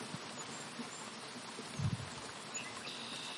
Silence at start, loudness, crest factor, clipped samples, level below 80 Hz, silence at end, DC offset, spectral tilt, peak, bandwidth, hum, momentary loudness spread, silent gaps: 0 s; -43 LUFS; 18 dB; under 0.1%; -70 dBFS; 0 s; under 0.1%; -3.5 dB/octave; -26 dBFS; 11.5 kHz; none; 6 LU; none